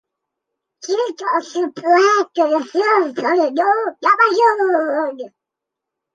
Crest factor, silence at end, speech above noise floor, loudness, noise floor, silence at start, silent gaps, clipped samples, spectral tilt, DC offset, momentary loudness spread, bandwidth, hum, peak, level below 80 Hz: 16 dB; 0.85 s; 67 dB; -16 LUFS; -83 dBFS; 0.85 s; none; under 0.1%; -3 dB/octave; under 0.1%; 10 LU; 9.2 kHz; none; -2 dBFS; -76 dBFS